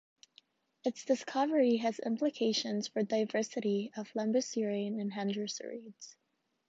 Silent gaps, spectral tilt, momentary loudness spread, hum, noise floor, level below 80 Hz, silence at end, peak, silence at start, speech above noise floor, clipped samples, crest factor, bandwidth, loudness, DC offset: none; -4.5 dB/octave; 11 LU; none; -67 dBFS; -84 dBFS; 0.55 s; -16 dBFS; 0.85 s; 33 dB; under 0.1%; 18 dB; 8 kHz; -34 LUFS; under 0.1%